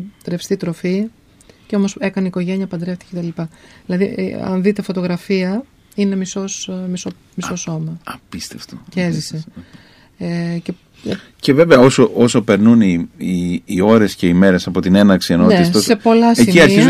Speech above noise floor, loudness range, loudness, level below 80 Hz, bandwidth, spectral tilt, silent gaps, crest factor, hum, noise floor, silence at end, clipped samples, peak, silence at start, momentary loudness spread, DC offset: 33 dB; 12 LU; -15 LUFS; -48 dBFS; 15 kHz; -6 dB/octave; none; 14 dB; none; -47 dBFS; 0 s; under 0.1%; 0 dBFS; 0 s; 17 LU; under 0.1%